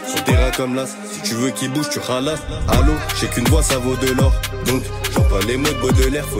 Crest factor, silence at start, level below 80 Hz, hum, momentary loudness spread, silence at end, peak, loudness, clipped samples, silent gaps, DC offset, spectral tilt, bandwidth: 16 dB; 0 s; -22 dBFS; none; 6 LU; 0 s; -2 dBFS; -18 LUFS; under 0.1%; none; under 0.1%; -4.5 dB/octave; 16.5 kHz